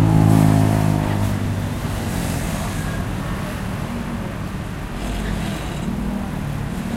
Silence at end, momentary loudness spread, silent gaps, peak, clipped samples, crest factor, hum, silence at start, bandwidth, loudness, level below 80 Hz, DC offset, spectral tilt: 0 s; 12 LU; none; -2 dBFS; under 0.1%; 18 dB; none; 0 s; 16 kHz; -22 LUFS; -30 dBFS; under 0.1%; -6.5 dB/octave